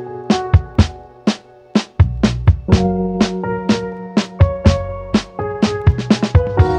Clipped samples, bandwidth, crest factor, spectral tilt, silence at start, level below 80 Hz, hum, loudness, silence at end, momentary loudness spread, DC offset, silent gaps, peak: under 0.1%; 9.2 kHz; 16 dB; -7 dB/octave; 0 s; -24 dBFS; none; -17 LUFS; 0 s; 7 LU; under 0.1%; none; 0 dBFS